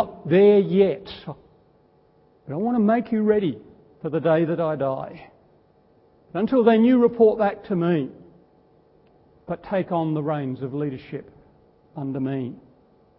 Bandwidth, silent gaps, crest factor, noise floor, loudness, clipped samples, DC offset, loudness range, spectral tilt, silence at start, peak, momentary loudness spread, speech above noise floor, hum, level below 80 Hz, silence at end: 5.6 kHz; none; 18 dB; -58 dBFS; -21 LUFS; under 0.1%; under 0.1%; 8 LU; -12 dB/octave; 0 s; -4 dBFS; 19 LU; 37 dB; none; -60 dBFS; 0.6 s